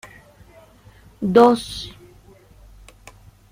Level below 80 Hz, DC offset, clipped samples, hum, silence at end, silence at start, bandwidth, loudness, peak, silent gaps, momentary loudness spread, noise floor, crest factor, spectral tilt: -50 dBFS; under 0.1%; under 0.1%; none; 1.6 s; 1.2 s; 15.5 kHz; -17 LUFS; -2 dBFS; none; 19 LU; -49 dBFS; 20 dB; -6 dB/octave